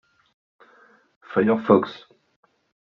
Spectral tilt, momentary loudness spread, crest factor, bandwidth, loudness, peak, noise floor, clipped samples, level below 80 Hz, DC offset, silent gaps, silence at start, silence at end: -6 dB/octave; 16 LU; 22 dB; 6 kHz; -21 LUFS; -4 dBFS; -56 dBFS; under 0.1%; -68 dBFS; under 0.1%; none; 1.3 s; 1 s